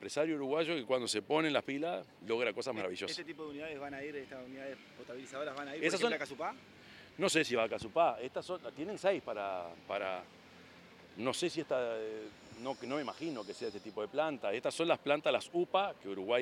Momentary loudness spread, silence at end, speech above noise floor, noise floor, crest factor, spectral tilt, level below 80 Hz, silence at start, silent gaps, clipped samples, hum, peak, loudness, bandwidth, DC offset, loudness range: 15 LU; 0 s; 21 dB; -57 dBFS; 22 dB; -3.5 dB/octave; -78 dBFS; 0 s; none; under 0.1%; none; -14 dBFS; -36 LUFS; 15.5 kHz; under 0.1%; 5 LU